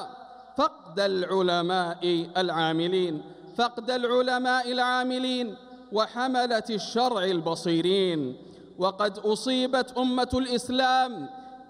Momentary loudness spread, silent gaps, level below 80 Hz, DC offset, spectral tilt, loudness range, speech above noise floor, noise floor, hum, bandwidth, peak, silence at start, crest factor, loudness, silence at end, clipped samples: 7 LU; none; -60 dBFS; under 0.1%; -4.5 dB/octave; 1 LU; 20 dB; -46 dBFS; none; 14.5 kHz; -10 dBFS; 0 s; 16 dB; -26 LUFS; 0.05 s; under 0.1%